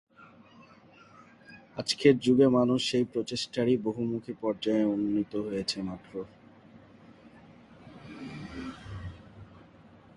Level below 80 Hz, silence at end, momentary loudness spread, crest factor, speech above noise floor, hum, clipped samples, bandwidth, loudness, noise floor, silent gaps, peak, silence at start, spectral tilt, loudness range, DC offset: -60 dBFS; 0.7 s; 21 LU; 22 dB; 28 dB; none; under 0.1%; 11.5 kHz; -28 LUFS; -56 dBFS; none; -8 dBFS; 0.2 s; -5.5 dB/octave; 19 LU; under 0.1%